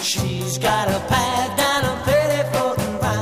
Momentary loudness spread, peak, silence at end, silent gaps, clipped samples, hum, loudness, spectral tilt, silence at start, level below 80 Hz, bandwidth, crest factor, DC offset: 4 LU; -6 dBFS; 0 s; none; under 0.1%; none; -20 LUFS; -4 dB/octave; 0 s; -40 dBFS; 15.5 kHz; 14 dB; 0.2%